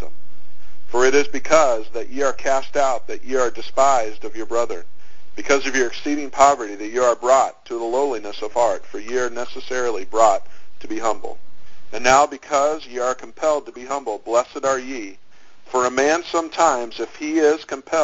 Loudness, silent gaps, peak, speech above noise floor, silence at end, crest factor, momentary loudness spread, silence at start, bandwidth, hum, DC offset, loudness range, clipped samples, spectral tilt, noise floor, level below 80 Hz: -20 LUFS; none; 0 dBFS; 35 dB; 0 s; 20 dB; 12 LU; 0 s; 7.8 kHz; none; 5%; 3 LU; under 0.1%; -2 dB/octave; -54 dBFS; -54 dBFS